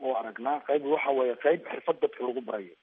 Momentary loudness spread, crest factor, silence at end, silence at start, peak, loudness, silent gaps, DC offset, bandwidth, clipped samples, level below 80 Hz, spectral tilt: 7 LU; 18 dB; 0.1 s; 0 s; -10 dBFS; -29 LUFS; none; under 0.1%; 3.8 kHz; under 0.1%; -88 dBFS; -3 dB/octave